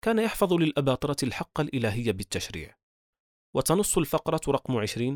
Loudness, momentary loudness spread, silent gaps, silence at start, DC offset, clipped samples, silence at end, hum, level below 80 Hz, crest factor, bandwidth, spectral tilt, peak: -27 LUFS; 9 LU; 2.83-3.13 s, 3.20-3.53 s; 0.05 s; under 0.1%; under 0.1%; 0 s; none; -50 dBFS; 18 dB; over 20 kHz; -5 dB/octave; -10 dBFS